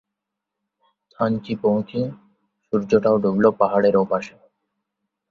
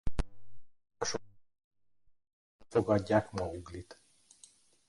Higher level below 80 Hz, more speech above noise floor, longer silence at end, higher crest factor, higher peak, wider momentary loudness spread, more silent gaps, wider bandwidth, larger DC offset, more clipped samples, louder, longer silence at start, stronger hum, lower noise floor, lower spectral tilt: second, -60 dBFS vs -48 dBFS; first, 63 dB vs 31 dB; about the same, 1 s vs 0.95 s; about the same, 20 dB vs 22 dB; first, -2 dBFS vs -14 dBFS; second, 10 LU vs 18 LU; second, none vs 1.64-1.71 s, 2.33-2.59 s; second, 7.2 kHz vs 11.5 kHz; neither; neither; first, -20 LUFS vs -34 LUFS; first, 1.2 s vs 0.05 s; neither; first, -83 dBFS vs -63 dBFS; first, -8 dB/octave vs -5.5 dB/octave